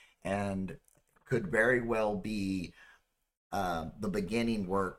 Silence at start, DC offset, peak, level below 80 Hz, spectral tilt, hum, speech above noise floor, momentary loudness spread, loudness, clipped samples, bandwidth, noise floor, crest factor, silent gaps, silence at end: 0.25 s; under 0.1%; -16 dBFS; -54 dBFS; -6 dB/octave; none; 34 dB; 11 LU; -33 LUFS; under 0.1%; 15.5 kHz; -66 dBFS; 18 dB; 3.37-3.50 s; 0 s